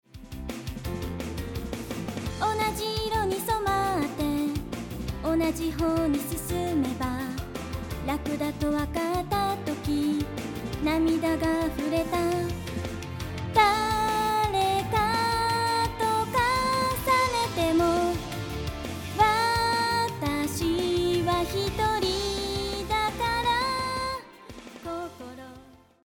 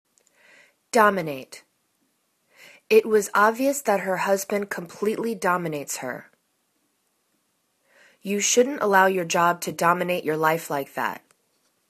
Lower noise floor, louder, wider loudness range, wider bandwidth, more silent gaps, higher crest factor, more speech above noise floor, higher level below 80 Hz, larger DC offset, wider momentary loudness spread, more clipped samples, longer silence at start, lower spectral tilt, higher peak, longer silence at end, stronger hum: second, -52 dBFS vs -71 dBFS; second, -27 LUFS vs -23 LUFS; second, 5 LU vs 8 LU; first, over 20 kHz vs 14 kHz; neither; about the same, 18 dB vs 22 dB; second, 25 dB vs 48 dB; first, -42 dBFS vs -72 dBFS; neither; about the same, 11 LU vs 12 LU; neither; second, 0.15 s vs 0.95 s; about the same, -4.5 dB/octave vs -3.5 dB/octave; second, -8 dBFS vs -2 dBFS; second, 0.3 s vs 0.75 s; neither